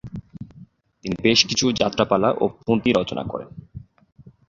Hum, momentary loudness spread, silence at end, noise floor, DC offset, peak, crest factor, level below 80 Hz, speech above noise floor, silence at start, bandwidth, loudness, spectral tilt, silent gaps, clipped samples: none; 23 LU; 0.65 s; -48 dBFS; under 0.1%; -2 dBFS; 22 dB; -50 dBFS; 28 dB; 0.05 s; 7.6 kHz; -20 LUFS; -4 dB/octave; none; under 0.1%